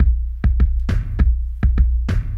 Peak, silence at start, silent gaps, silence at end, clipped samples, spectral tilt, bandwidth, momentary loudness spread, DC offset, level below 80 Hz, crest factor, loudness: -4 dBFS; 0 s; none; 0 s; under 0.1%; -8.5 dB/octave; 5 kHz; 3 LU; under 0.1%; -16 dBFS; 12 dB; -20 LUFS